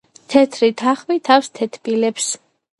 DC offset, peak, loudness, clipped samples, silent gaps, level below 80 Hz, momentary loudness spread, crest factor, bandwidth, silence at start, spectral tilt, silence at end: under 0.1%; 0 dBFS; -17 LUFS; under 0.1%; none; -64 dBFS; 9 LU; 18 dB; 11.5 kHz; 0.3 s; -3 dB/octave; 0.45 s